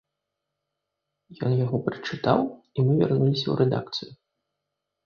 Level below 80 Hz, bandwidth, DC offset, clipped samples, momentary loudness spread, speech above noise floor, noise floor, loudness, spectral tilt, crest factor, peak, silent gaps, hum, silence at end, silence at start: -62 dBFS; 6.8 kHz; under 0.1%; under 0.1%; 10 LU; 59 dB; -83 dBFS; -25 LUFS; -8 dB/octave; 20 dB; -6 dBFS; none; none; 0.9 s; 1.3 s